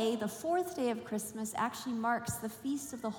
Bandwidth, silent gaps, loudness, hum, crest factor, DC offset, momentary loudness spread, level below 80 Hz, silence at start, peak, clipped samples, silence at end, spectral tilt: 18 kHz; none; -36 LUFS; none; 16 dB; under 0.1%; 5 LU; -68 dBFS; 0 s; -20 dBFS; under 0.1%; 0 s; -4 dB/octave